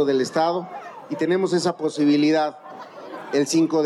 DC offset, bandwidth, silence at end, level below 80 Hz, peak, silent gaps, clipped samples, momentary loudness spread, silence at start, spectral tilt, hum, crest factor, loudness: under 0.1%; 12.5 kHz; 0 s; -84 dBFS; -8 dBFS; none; under 0.1%; 19 LU; 0 s; -5 dB/octave; none; 14 dB; -21 LUFS